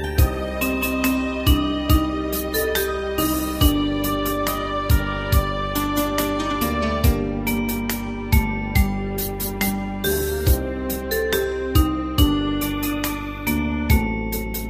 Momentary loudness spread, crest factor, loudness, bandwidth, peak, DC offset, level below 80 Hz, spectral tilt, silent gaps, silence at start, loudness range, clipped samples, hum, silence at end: 5 LU; 18 dB; -22 LUFS; 15.5 kHz; -2 dBFS; under 0.1%; -26 dBFS; -5 dB/octave; none; 0 s; 2 LU; under 0.1%; none; 0 s